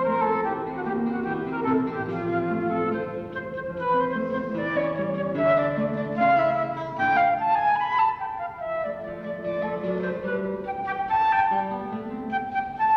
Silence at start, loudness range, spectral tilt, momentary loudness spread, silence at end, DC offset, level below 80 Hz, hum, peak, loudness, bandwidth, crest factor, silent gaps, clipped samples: 0 s; 4 LU; -8.5 dB/octave; 10 LU; 0 s; under 0.1%; -56 dBFS; none; -12 dBFS; -25 LUFS; 6.4 kHz; 12 dB; none; under 0.1%